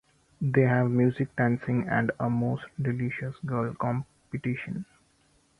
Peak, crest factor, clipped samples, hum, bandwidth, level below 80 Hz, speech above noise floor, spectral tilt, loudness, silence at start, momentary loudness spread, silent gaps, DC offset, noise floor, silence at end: -10 dBFS; 18 dB; under 0.1%; none; 4.6 kHz; -60 dBFS; 38 dB; -9.5 dB/octave; -28 LUFS; 0.4 s; 11 LU; none; under 0.1%; -65 dBFS; 0.75 s